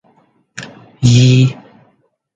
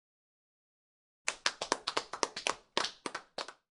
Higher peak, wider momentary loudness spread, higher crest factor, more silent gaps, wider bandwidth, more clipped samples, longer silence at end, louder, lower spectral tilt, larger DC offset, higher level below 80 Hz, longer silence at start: first, 0 dBFS vs -4 dBFS; first, 25 LU vs 9 LU; second, 14 dB vs 36 dB; neither; second, 7.8 kHz vs 11.5 kHz; neither; first, 0.85 s vs 0.2 s; first, -11 LUFS vs -36 LUFS; first, -6 dB/octave vs 0 dB/octave; neither; first, -42 dBFS vs -74 dBFS; second, 0.55 s vs 1.25 s